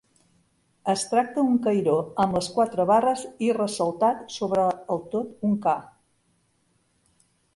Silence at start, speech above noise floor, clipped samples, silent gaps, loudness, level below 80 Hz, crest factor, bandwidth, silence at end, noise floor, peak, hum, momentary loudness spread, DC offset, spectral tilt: 0.85 s; 44 dB; under 0.1%; none; -24 LUFS; -62 dBFS; 16 dB; 11.5 kHz; 1.7 s; -68 dBFS; -10 dBFS; none; 7 LU; under 0.1%; -5.5 dB/octave